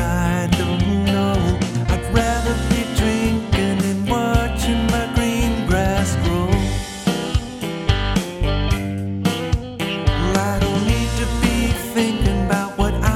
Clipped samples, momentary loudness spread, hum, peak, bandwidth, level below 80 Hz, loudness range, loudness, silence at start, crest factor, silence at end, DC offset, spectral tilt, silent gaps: under 0.1%; 4 LU; none; 0 dBFS; 16.5 kHz; -26 dBFS; 2 LU; -20 LUFS; 0 s; 18 dB; 0 s; under 0.1%; -5.5 dB/octave; none